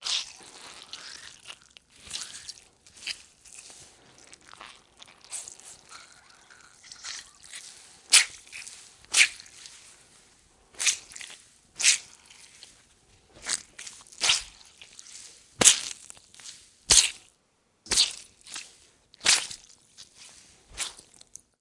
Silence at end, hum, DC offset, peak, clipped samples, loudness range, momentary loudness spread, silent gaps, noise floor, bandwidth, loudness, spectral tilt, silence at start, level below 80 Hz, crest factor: 0.7 s; none; under 0.1%; 0 dBFS; under 0.1%; 19 LU; 28 LU; none; -69 dBFS; 12 kHz; -23 LUFS; 1.5 dB/octave; 0 s; -60 dBFS; 32 dB